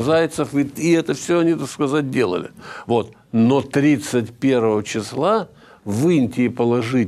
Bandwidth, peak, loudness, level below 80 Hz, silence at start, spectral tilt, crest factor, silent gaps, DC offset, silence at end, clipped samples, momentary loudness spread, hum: 14.5 kHz; -4 dBFS; -19 LUFS; -60 dBFS; 0 s; -6 dB/octave; 14 dB; none; under 0.1%; 0 s; under 0.1%; 7 LU; none